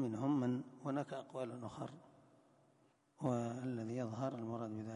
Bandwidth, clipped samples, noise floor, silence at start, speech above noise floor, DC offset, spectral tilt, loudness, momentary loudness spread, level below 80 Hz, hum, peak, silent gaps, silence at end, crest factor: 10.5 kHz; under 0.1%; -73 dBFS; 0 s; 31 dB; under 0.1%; -8 dB/octave; -42 LUFS; 11 LU; -80 dBFS; none; -24 dBFS; none; 0 s; 18 dB